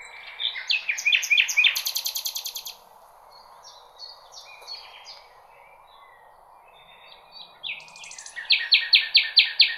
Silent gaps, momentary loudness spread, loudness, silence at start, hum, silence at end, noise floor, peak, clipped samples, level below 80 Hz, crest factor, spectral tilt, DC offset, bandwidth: none; 26 LU; -20 LUFS; 0 s; none; 0 s; -52 dBFS; -4 dBFS; under 0.1%; -70 dBFS; 24 dB; 5 dB/octave; under 0.1%; 15.5 kHz